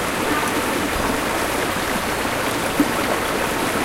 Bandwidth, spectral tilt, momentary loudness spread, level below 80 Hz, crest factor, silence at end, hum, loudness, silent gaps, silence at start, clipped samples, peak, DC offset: 16 kHz; -3.5 dB/octave; 2 LU; -40 dBFS; 16 dB; 0 s; none; -21 LUFS; none; 0 s; under 0.1%; -4 dBFS; under 0.1%